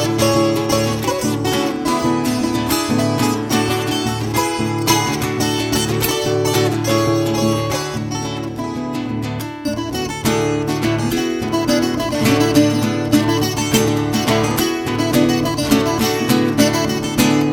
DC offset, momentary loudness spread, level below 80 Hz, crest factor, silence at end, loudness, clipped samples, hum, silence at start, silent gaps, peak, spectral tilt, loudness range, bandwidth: under 0.1%; 8 LU; -40 dBFS; 16 dB; 0 s; -17 LUFS; under 0.1%; none; 0 s; none; 0 dBFS; -4.5 dB/octave; 4 LU; 18.5 kHz